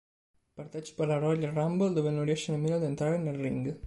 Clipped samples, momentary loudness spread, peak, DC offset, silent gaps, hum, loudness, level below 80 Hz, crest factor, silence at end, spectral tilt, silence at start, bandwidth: under 0.1%; 12 LU; -18 dBFS; under 0.1%; none; none; -30 LUFS; -64 dBFS; 14 dB; 0 s; -7 dB/octave; 0.55 s; 11.5 kHz